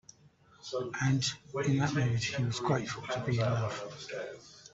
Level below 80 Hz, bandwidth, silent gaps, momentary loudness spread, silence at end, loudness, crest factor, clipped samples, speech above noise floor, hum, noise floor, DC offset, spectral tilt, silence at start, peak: -62 dBFS; 8 kHz; none; 11 LU; 0.05 s; -33 LUFS; 18 dB; under 0.1%; 30 dB; none; -62 dBFS; under 0.1%; -5.5 dB/octave; 0.65 s; -16 dBFS